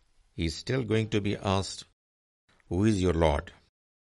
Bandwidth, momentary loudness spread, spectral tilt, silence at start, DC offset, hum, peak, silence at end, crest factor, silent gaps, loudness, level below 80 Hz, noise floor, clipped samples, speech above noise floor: 11.5 kHz; 11 LU; -6 dB/octave; 0.35 s; under 0.1%; none; -10 dBFS; 0.5 s; 20 dB; 1.93-2.48 s; -29 LUFS; -46 dBFS; under -90 dBFS; under 0.1%; over 62 dB